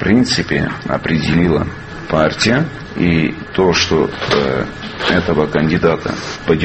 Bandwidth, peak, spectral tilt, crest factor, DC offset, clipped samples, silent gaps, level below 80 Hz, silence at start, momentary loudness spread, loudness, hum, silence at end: 8.6 kHz; 0 dBFS; -5.5 dB/octave; 16 dB; under 0.1%; under 0.1%; none; -36 dBFS; 0 s; 8 LU; -15 LUFS; none; 0 s